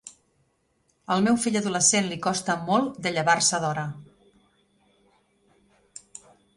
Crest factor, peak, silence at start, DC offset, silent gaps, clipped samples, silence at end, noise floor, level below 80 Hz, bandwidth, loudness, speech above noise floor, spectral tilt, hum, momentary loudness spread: 22 dB; -6 dBFS; 0.05 s; under 0.1%; none; under 0.1%; 2.55 s; -70 dBFS; -66 dBFS; 11.5 kHz; -23 LUFS; 46 dB; -3 dB/octave; none; 26 LU